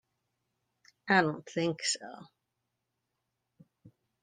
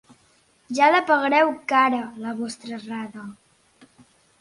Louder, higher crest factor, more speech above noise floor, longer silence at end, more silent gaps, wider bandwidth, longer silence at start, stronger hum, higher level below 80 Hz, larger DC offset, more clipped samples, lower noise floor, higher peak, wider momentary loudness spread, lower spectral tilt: second, -30 LUFS vs -21 LUFS; first, 24 dB vs 18 dB; first, 53 dB vs 39 dB; second, 0.35 s vs 1.1 s; neither; second, 10 kHz vs 11.5 kHz; first, 1.05 s vs 0.7 s; neither; second, -78 dBFS vs -72 dBFS; neither; neither; first, -84 dBFS vs -60 dBFS; second, -12 dBFS vs -4 dBFS; first, 22 LU vs 17 LU; about the same, -3.5 dB/octave vs -4 dB/octave